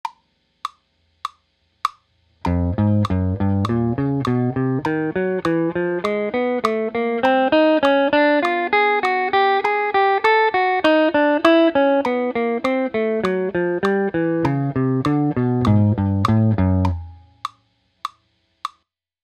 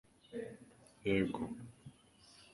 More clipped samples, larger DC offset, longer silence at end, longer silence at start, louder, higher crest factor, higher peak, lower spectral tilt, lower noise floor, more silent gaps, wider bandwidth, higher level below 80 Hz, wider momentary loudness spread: neither; neither; first, 0.55 s vs 0.05 s; second, 0.05 s vs 0.3 s; first, -18 LUFS vs -40 LUFS; about the same, 18 dB vs 20 dB; first, 0 dBFS vs -22 dBFS; about the same, -7.5 dB/octave vs -6.5 dB/octave; about the same, -67 dBFS vs -64 dBFS; neither; about the same, 12 kHz vs 11.5 kHz; first, -44 dBFS vs -66 dBFS; second, 18 LU vs 25 LU